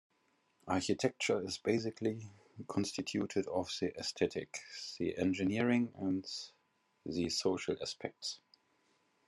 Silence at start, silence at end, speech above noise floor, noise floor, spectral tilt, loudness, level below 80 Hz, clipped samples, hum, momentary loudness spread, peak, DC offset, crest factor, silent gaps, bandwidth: 0.65 s; 0.9 s; 40 dB; -76 dBFS; -4.5 dB/octave; -37 LUFS; -74 dBFS; under 0.1%; none; 11 LU; -18 dBFS; under 0.1%; 20 dB; none; 12.5 kHz